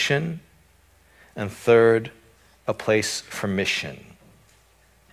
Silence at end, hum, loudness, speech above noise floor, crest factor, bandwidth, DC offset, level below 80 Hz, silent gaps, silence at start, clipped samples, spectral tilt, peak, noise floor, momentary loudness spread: 1.15 s; none; -23 LUFS; 36 dB; 20 dB; 15.5 kHz; under 0.1%; -56 dBFS; none; 0 s; under 0.1%; -4.5 dB/octave; -4 dBFS; -58 dBFS; 22 LU